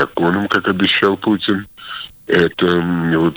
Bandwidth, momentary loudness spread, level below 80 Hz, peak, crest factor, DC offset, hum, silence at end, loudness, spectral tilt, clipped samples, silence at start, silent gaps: over 20 kHz; 15 LU; -48 dBFS; -2 dBFS; 14 dB; under 0.1%; none; 0 s; -16 LUFS; -7 dB/octave; under 0.1%; 0 s; none